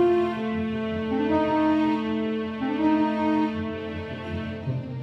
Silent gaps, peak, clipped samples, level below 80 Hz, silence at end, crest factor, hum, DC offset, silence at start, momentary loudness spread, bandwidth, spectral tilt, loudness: none; -12 dBFS; under 0.1%; -52 dBFS; 0 s; 14 dB; none; under 0.1%; 0 s; 10 LU; 6.2 kHz; -8 dB/octave; -26 LUFS